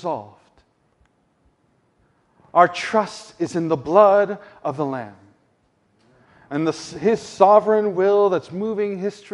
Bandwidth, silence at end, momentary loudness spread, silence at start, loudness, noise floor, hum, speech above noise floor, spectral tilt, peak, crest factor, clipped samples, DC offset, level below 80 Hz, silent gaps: 11 kHz; 0.25 s; 15 LU; 0.05 s; -19 LUFS; -64 dBFS; none; 45 dB; -6 dB/octave; 0 dBFS; 20 dB; under 0.1%; under 0.1%; -64 dBFS; none